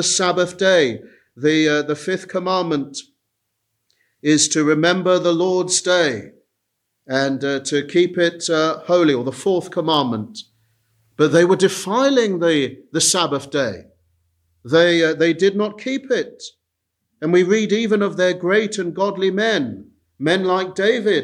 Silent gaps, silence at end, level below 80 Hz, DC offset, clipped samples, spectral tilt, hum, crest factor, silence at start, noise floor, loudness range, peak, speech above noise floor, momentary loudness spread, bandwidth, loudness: none; 0 s; -66 dBFS; under 0.1%; under 0.1%; -3.5 dB/octave; none; 16 dB; 0 s; -76 dBFS; 2 LU; -2 dBFS; 58 dB; 9 LU; 13.5 kHz; -18 LUFS